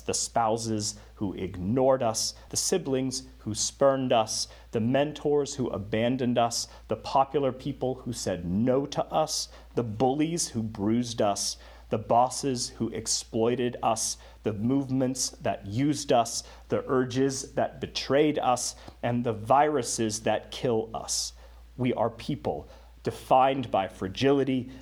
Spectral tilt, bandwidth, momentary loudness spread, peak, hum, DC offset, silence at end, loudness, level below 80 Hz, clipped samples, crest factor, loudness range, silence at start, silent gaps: -4.5 dB/octave; 18 kHz; 9 LU; -10 dBFS; none; under 0.1%; 0 s; -28 LUFS; -52 dBFS; under 0.1%; 18 dB; 2 LU; 0 s; none